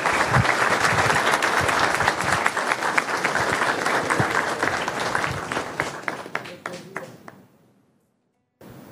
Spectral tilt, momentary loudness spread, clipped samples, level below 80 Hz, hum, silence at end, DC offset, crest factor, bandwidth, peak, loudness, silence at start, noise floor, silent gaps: -3.5 dB/octave; 13 LU; under 0.1%; -50 dBFS; none; 0 s; under 0.1%; 24 dB; 16 kHz; 0 dBFS; -22 LUFS; 0 s; -70 dBFS; none